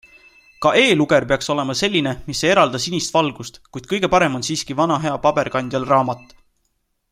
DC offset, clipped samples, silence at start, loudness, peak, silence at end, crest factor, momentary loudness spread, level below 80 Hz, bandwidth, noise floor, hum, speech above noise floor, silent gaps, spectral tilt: under 0.1%; under 0.1%; 0.6 s; -18 LUFS; 0 dBFS; 0.95 s; 18 dB; 10 LU; -48 dBFS; 15.5 kHz; -69 dBFS; none; 51 dB; none; -4 dB/octave